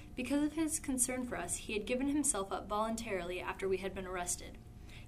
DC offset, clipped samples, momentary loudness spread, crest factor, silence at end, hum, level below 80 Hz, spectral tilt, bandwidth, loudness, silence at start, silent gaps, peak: under 0.1%; under 0.1%; 8 LU; 20 dB; 0 s; none; -54 dBFS; -3.5 dB/octave; 15.5 kHz; -36 LUFS; 0 s; none; -18 dBFS